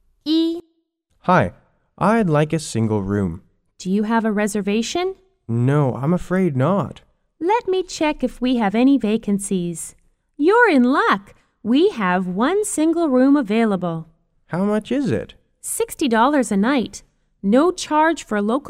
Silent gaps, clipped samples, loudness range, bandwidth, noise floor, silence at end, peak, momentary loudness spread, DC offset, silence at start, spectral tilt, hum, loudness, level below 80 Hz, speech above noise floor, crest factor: none; under 0.1%; 3 LU; 16 kHz; -67 dBFS; 0 s; -2 dBFS; 11 LU; under 0.1%; 0.25 s; -5.5 dB/octave; none; -19 LUFS; -48 dBFS; 48 dB; 16 dB